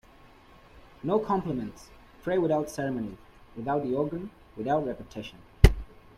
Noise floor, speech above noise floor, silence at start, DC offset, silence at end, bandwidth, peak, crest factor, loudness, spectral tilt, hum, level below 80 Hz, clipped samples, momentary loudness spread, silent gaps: -54 dBFS; 25 dB; 0.75 s; under 0.1%; 0.3 s; 15.5 kHz; -2 dBFS; 28 dB; -29 LUFS; -7 dB/octave; none; -34 dBFS; under 0.1%; 18 LU; none